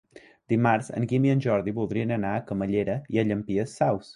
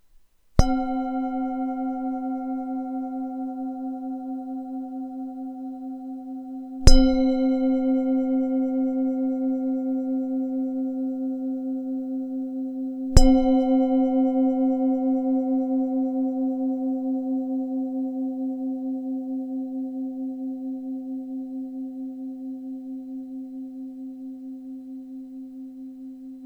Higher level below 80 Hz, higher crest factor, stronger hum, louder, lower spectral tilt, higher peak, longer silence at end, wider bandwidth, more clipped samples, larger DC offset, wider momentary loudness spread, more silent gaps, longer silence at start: second, -56 dBFS vs -30 dBFS; second, 16 dB vs 24 dB; neither; about the same, -26 LUFS vs -26 LUFS; first, -8 dB/octave vs -6.5 dB/octave; second, -10 dBFS vs 0 dBFS; about the same, 0.05 s vs 0 s; about the same, 11 kHz vs 11 kHz; neither; neither; second, 6 LU vs 15 LU; neither; second, 0.15 s vs 0.55 s